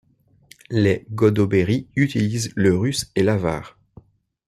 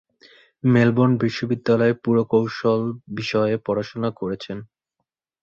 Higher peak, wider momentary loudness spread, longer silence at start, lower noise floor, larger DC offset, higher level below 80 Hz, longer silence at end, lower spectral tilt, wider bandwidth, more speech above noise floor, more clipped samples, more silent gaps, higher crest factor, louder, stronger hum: about the same, -4 dBFS vs -4 dBFS; second, 5 LU vs 11 LU; about the same, 0.7 s vs 0.65 s; second, -53 dBFS vs -79 dBFS; neither; first, -52 dBFS vs -58 dBFS; about the same, 0.8 s vs 0.8 s; second, -6 dB/octave vs -8 dB/octave; first, 14 kHz vs 7.2 kHz; second, 33 dB vs 59 dB; neither; neither; about the same, 18 dB vs 16 dB; about the same, -20 LUFS vs -21 LUFS; neither